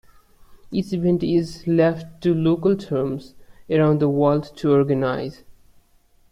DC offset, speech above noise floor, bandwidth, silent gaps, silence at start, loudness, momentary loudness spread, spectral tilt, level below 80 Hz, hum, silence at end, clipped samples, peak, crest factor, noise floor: under 0.1%; 37 dB; 11.5 kHz; none; 0.5 s; -21 LUFS; 9 LU; -8.5 dB/octave; -52 dBFS; none; 0.8 s; under 0.1%; -6 dBFS; 16 dB; -57 dBFS